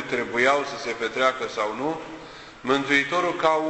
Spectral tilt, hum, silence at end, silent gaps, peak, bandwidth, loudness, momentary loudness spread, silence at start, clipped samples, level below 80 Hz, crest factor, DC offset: -3.5 dB/octave; none; 0 s; none; -4 dBFS; 8.4 kHz; -23 LUFS; 14 LU; 0 s; under 0.1%; -60 dBFS; 20 dB; under 0.1%